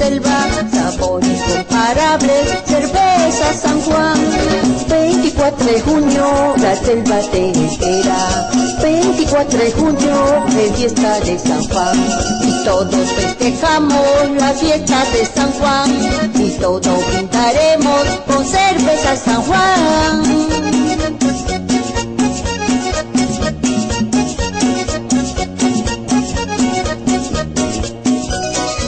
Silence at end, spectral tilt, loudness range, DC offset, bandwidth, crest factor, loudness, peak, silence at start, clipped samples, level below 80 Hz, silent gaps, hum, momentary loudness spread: 0 s; -4 dB/octave; 4 LU; under 0.1%; 9.6 kHz; 10 dB; -14 LUFS; -4 dBFS; 0 s; under 0.1%; -30 dBFS; none; none; 5 LU